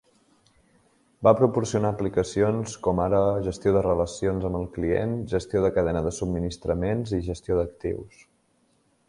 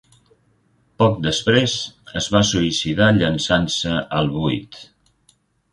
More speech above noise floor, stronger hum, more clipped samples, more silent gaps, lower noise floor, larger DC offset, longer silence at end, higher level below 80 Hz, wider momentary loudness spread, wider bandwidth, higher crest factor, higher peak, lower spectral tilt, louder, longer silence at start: about the same, 42 dB vs 42 dB; neither; neither; neither; first, -67 dBFS vs -61 dBFS; neither; about the same, 1 s vs 0.9 s; about the same, -42 dBFS vs -44 dBFS; second, 7 LU vs 10 LU; about the same, 11.5 kHz vs 11.5 kHz; about the same, 22 dB vs 20 dB; second, -4 dBFS vs 0 dBFS; first, -7 dB/octave vs -4.5 dB/octave; second, -25 LUFS vs -19 LUFS; first, 1.2 s vs 1 s